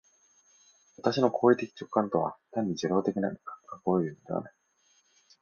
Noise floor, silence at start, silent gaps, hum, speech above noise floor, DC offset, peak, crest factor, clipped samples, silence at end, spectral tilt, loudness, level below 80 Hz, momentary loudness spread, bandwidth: -69 dBFS; 1 s; none; none; 40 dB; under 0.1%; -10 dBFS; 22 dB; under 0.1%; 0.9 s; -6.5 dB/octave; -29 LUFS; -70 dBFS; 12 LU; 7 kHz